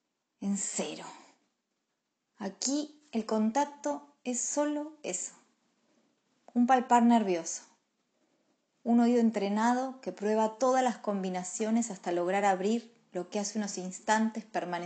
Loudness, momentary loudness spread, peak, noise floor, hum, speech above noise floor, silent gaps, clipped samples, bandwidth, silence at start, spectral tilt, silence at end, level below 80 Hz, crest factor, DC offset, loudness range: -30 LUFS; 13 LU; -10 dBFS; -83 dBFS; none; 53 dB; none; under 0.1%; 9.2 kHz; 0.4 s; -4 dB/octave; 0 s; -86 dBFS; 22 dB; under 0.1%; 6 LU